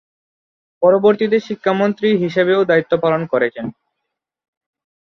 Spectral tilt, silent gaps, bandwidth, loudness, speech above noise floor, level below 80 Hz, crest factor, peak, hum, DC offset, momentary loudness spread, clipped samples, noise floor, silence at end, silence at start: -7.5 dB/octave; none; 6.4 kHz; -16 LUFS; 63 dB; -62 dBFS; 16 dB; -2 dBFS; none; under 0.1%; 6 LU; under 0.1%; -78 dBFS; 1.3 s; 0.8 s